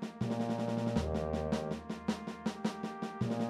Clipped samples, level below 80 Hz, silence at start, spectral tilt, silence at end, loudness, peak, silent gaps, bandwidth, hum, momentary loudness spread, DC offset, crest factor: under 0.1%; -50 dBFS; 0 s; -7 dB/octave; 0 s; -37 LUFS; -20 dBFS; none; 12.5 kHz; none; 6 LU; under 0.1%; 16 dB